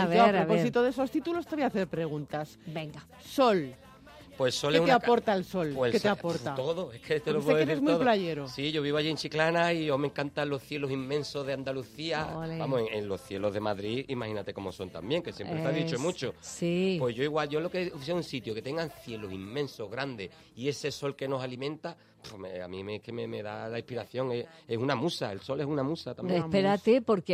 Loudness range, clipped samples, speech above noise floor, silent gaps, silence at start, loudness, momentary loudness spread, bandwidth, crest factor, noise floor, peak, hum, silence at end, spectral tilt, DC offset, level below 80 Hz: 8 LU; under 0.1%; 22 dB; none; 0 s; -31 LUFS; 13 LU; 15.5 kHz; 20 dB; -52 dBFS; -10 dBFS; none; 0 s; -5.5 dB/octave; under 0.1%; -64 dBFS